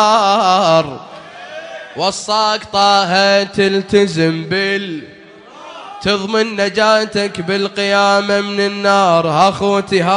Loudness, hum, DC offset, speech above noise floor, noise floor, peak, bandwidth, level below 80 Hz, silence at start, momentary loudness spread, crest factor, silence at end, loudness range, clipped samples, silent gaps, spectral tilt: -14 LUFS; none; under 0.1%; 25 dB; -38 dBFS; 0 dBFS; 10.5 kHz; -52 dBFS; 0 s; 18 LU; 14 dB; 0 s; 3 LU; under 0.1%; none; -4 dB/octave